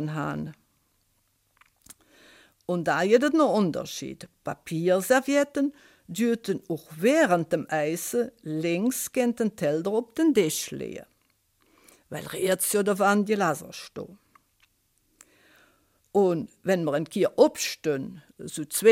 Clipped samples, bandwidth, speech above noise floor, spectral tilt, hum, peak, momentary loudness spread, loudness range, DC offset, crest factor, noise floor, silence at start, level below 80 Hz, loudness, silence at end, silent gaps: under 0.1%; 16.5 kHz; 45 dB; -4.5 dB/octave; none; -6 dBFS; 16 LU; 5 LU; under 0.1%; 20 dB; -70 dBFS; 0 s; -68 dBFS; -26 LUFS; 0 s; none